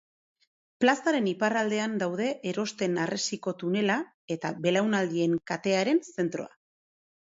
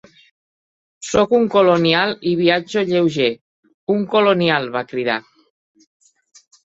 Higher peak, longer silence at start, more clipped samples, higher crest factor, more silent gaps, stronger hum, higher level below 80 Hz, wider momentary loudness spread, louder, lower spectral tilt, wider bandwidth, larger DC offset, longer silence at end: second, -8 dBFS vs -2 dBFS; second, 0.8 s vs 1 s; neither; about the same, 20 dB vs 18 dB; second, 4.14-4.28 s vs 3.41-3.63 s, 3.74-3.87 s; neither; second, -74 dBFS vs -56 dBFS; about the same, 7 LU vs 9 LU; second, -28 LUFS vs -17 LUFS; about the same, -5 dB/octave vs -5 dB/octave; about the same, 7.8 kHz vs 8 kHz; neither; second, 0.8 s vs 1.45 s